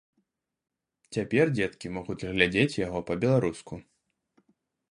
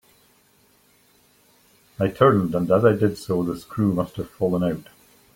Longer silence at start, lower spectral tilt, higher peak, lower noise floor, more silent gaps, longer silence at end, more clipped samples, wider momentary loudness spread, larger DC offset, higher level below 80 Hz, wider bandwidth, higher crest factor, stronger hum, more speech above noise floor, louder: second, 1.1 s vs 2 s; second, -6 dB/octave vs -8 dB/octave; second, -6 dBFS vs -2 dBFS; first, -78 dBFS vs -59 dBFS; neither; first, 1.1 s vs 0.55 s; neither; first, 14 LU vs 9 LU; neither; about the same, -56 dBFS vs -54 dBFS; second, 11 kHz vs 16.5 kHz; about the same, 24 dB vs 22 dB; neither; first, 51 dB vs 38 dB; second, -27 LUFS vs -22 LUFS